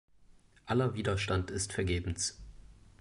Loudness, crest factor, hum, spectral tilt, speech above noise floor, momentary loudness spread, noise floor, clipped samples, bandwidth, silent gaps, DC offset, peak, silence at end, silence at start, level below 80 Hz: -33 LUFS; 16 dB; none; -4.5 dB/octave; 29 dB; 5 LU; -61 dBFS; under 0.1%; 11.5 kHz; none; under 0.1%; -18 dBFS; 0.25 s; 0.65 s; -46 dBFS